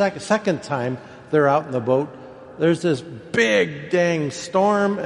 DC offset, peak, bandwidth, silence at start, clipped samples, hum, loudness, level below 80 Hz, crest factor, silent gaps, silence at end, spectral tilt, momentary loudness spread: under 0.1%; -4 dBFS; 11.5 kHz; 0 s; under 0.1%; none; -21 LUFS; -62 dBFS; 16 dB; none; 0 s; -5.5 dB/octave; 10 LU